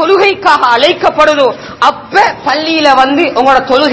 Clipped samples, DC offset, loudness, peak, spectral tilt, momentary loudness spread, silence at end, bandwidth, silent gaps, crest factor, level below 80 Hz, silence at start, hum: 3%; under 0.1%; -8 LUFS; 0 dBFS; -3.5 dB/octave; 4 LU; 0 s; 8 kHz; none; 8 dB; -44 dBFS; 0 s; none